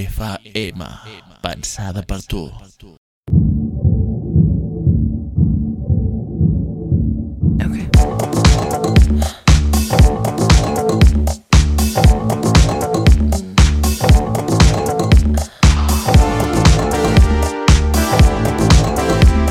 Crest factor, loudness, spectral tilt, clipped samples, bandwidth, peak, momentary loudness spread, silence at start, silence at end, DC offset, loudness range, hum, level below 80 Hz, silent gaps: 14 dB; -15 LUFS; -5.5 dB/octave; under 0.1%; 16 kHz; 0 dBFS; 11 LU; 0 s; 0 s; under 0.1%; 5 LU; none; -16 dBFS; 2.97-3.23 s